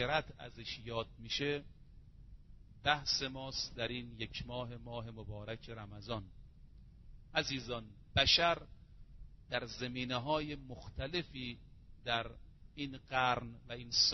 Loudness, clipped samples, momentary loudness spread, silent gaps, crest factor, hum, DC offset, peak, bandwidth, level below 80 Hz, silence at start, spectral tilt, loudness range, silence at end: -38 LUFS; under 0.1%; 15 LU; none; 26 dB; none; under 0.1%; -14 dBFS; 6.2 kHz; -56 dBFS; 0 s; -1.5 dB/octave; 8 LU; 0 s